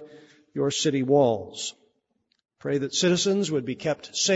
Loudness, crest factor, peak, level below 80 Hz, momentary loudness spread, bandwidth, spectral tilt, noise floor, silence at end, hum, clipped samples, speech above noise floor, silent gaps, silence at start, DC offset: -25 LUFS; 18 dB; -8 dBFS; -66 dBFS; 13 LU; 8 kHz; -4 dB/octave; -73 dBFS; 0 s; none; under 0.1%; 49 dB; none; 0 s; under 0.1%